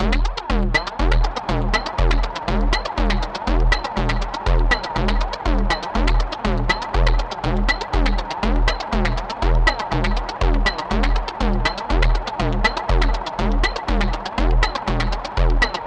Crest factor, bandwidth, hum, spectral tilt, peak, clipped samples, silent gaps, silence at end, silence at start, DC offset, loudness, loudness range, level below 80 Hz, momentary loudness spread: 16 dB; 8.4 kHz; none; -5.5 dB/octave; -2 dBFS; under 0.1%; none; 0 s; 0 s; under 0.1%; -21 LUFS; 0 LU; -20 dBFS; 4 LU